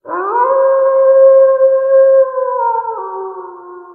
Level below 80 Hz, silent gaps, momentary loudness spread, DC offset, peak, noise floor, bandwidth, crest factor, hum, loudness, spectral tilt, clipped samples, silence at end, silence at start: -74 dBFS; none; 17 LU; under 0.1%; 0 dBFS; -32 dBFS; 2.2 kHz; 12 dB; none; -10 LUFS; -9 dB/octave; under 0.1%; 0 s; 0.05 s